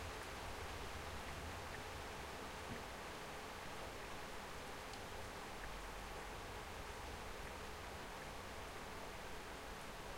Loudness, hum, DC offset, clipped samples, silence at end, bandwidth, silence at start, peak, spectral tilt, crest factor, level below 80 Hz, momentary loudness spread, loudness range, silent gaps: -50 LUFS; none; under 0.1%; under 0.1%; 0 s; 16 kHz; 0 s; -36 dBFS; -3.5 dB/octave; 14 dB; -58 dBFS; 2 LU; 1 LU; none